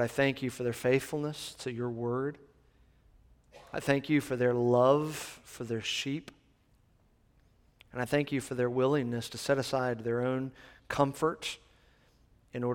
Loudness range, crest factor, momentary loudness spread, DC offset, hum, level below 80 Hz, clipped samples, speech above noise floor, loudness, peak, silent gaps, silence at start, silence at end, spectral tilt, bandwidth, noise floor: 6 LU; 22 dB; 12 LU; under 0.1%; none; -64 dBFS; under 0.1%; 36 dB; -31 LUFS; -10 dBFS; none; 0 s; 0 s; -5.5 dB/octave; 18 kHz; -67 dBFS